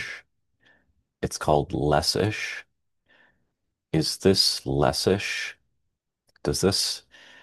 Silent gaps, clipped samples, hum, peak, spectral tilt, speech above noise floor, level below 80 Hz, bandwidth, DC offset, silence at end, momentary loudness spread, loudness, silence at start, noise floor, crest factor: none; under 0.1%; none; -6 dBFS; -4 dB/octave; 55 dB; -48 dBFS; 12.5 kHz; under 0.1%; 0.45 s; 14 LU; -24 LUFS; 0 s; -78 dBFS; 22 dB